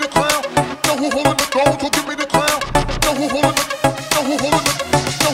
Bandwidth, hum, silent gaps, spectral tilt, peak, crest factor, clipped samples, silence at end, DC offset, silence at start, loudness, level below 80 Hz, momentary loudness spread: 16.5 kHz; none; none; -3.5 dB/octave; 0 dBFS; 18 dB; under 0.1%; 0 s; under 0.1%; 0 s; -17 LUFS; -34 dBFS; 3 LU